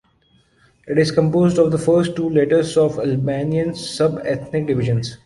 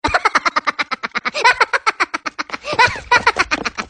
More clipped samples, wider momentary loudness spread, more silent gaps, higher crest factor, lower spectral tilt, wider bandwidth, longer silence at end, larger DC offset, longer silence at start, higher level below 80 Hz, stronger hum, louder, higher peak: neither; about the same, 6 LU vs 8 LU; neither; about the same, 16 dB vs 18 dB; first, -7 dB/octave vs -2 dB/octave; about the same, 11.5 kHz vs 10.5 kHz; about the same, 0.1 s vs 0.05 s; neither; first, 0.85 s vs 0.05 s; second, -50 dBFS vs -44 dBFS; neither; about the same, -18 LUFS vs -16 LUFS; about the same, -2 dBFS vs 0 dBFS